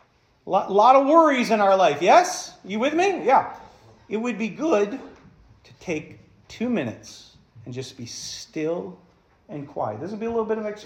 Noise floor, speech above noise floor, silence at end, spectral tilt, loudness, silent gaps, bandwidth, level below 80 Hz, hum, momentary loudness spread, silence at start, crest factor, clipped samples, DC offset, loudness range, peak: -52 dBFS; 30 dB; 0 s; -4.5 dB/octave; -21 LUFS; none; 15 kHz; -64 dBFS; none; 19 LU; 0.45 s; 20 dB; under 0.1%; under 0.1%; 14 LU; -4 dBFS